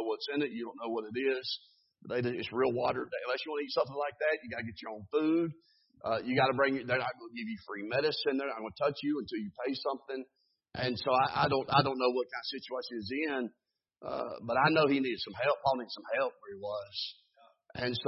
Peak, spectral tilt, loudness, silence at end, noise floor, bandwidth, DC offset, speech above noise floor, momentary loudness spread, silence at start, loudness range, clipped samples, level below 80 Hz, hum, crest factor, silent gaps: -10 dBFS; -8.5 dB/octave; -33 LUFS; 0 s; -63 dBFS; 6 kHz; under 0.1%; 30 dB; 13 LU; 0 s; 3 LU; under 0.1%; -66 dBFS; none; 24 dB; none